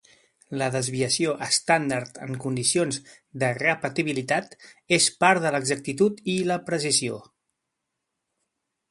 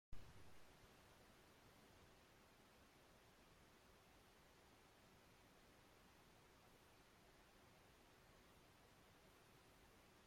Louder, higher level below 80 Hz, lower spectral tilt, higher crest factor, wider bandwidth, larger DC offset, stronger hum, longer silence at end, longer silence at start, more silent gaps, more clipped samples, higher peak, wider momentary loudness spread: first, -24 LUFS vs -69 LUFS; first, -66 dBFS vs -76 dBFS; about the same, -3.5 dB/octave vs -4 dB/octave; about the same, 24 dB vs 22 dB; second, 12 kHz vs 16 kHz; neither; neither; first, 1.65 s vs 0 s; first, 0.5 s vs 0.1 s; neither; neither; first, -2 dBFS vs -42 dBFS; first, 11 LU vs 3 LU